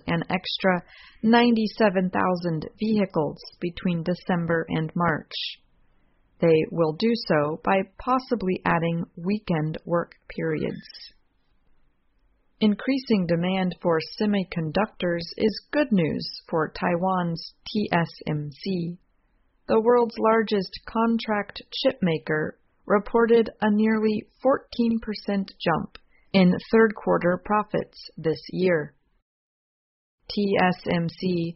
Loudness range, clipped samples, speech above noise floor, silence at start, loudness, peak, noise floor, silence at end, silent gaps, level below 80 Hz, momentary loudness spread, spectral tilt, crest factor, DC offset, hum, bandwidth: 4 LU; under 0.1%; 41 dB; 0.05 s; -24 LUFS; -6 dBFS; -65 dBFS; 0.05 s; 29.22-30.18 s; -54 dBFS; 10 LU; -5 dB/octave; 20 dB; under 0.1%; none; 6 kHz